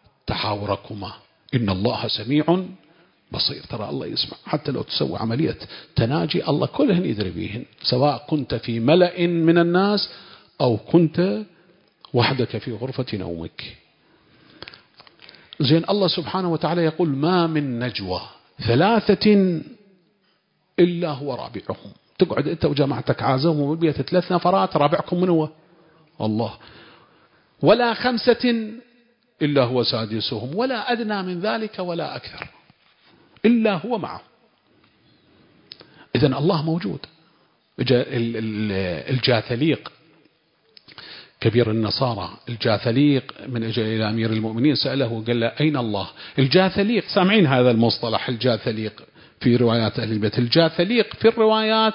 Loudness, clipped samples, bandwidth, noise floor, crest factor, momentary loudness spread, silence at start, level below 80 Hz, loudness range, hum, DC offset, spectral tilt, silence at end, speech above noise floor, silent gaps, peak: -21 LUFS; under 0.1%; 5.6 kHz; -66 dBFS; 20 dB; 13 LU; 0.25 s; -52 dBFS; 6 LU; none; under 0.1%; -11 dB/octave; 0 s; 45 dB; none; -2 dBFS